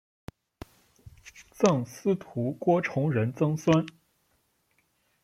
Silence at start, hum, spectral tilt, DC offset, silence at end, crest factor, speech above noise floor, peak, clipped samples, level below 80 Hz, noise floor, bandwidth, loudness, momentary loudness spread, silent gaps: 1.25 s; none; -7 dB/octave; under 0.1%; 1.35 s; 22 dB; 46 dB; -8 dBFS; under 0.1%; -62 dBFS; -72 dBFS; 15 kHz; -27 LUFS; 24 LU; none